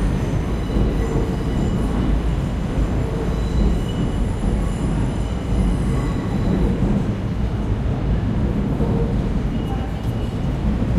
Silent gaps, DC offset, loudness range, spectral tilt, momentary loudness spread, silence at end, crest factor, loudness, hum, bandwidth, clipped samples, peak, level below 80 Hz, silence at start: none; under 0.1%; 1 LU; -8 dB/octave; 3 LU; 0 s; 14 dB; -22 LUFS; none; 11 kHz; under 0.1%; -6 dBFS; -24 dBFS; 0 s